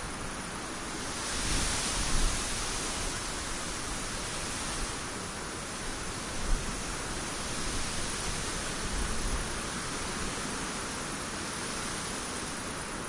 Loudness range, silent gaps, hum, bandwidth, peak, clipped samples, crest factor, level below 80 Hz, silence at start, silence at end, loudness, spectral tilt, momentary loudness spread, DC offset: 3 LU; none; none; 11.5 kHz; -14 dBFS; under 0.1%; 18 dB; -40 dBFS; 0 s; 0 s; -33 LUFS; -2.5 dB/octave; 6 LU; under 0.1%